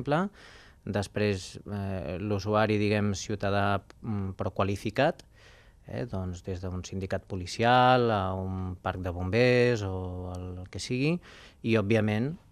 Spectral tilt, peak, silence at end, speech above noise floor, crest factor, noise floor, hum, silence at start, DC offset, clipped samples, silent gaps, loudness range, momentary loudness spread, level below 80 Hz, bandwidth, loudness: -6 dB/octave; -8 dBFS; 0.15 s; 26 dB; 20 dB; -55 dBFS; none; 0 s; under 0.1%; under 0.1%; none; 6 LU; 13 LU; -56 dBFS; 13 kHz; -29 LUFS